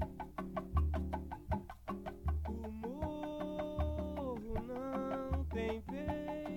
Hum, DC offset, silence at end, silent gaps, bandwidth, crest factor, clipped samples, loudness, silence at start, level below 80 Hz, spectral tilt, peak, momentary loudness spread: none; under 0.1%; 0 s; none; 16.5 kHz; 18 dB; under 0.1%; -41 LUFS; 0 s; -44 dBFS; -8.5 dB/octave; -22 dBFS; 5 LU